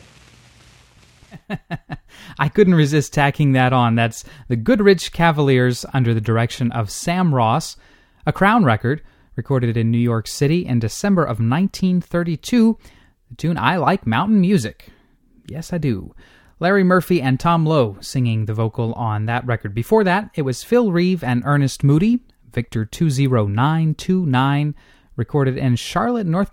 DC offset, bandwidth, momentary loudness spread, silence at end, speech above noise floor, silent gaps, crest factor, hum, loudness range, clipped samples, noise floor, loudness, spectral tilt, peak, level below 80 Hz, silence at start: under 0.1%; 17 kHz; 12 LU; 0.05 s; 36 dB; none; 18 dB; none; 3 LU; under 0.1%; -54 dBFS; -18 LUFS; -6.5 dB/octave; 0 dBFS; -44 dBFS; 1.3 s